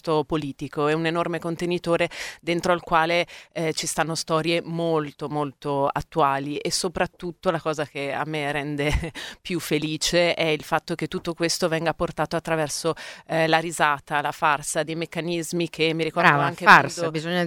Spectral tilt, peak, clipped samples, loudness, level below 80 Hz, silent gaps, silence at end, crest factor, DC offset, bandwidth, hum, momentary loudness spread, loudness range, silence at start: -4 dB/octave; 0 dBFS; under 0.1%; -23 LUFS; -46 dBFS; none; 0 s; 24 dB; under 0.1%; 17 kHz; none; 9 LU; 3 LU; 0.05 s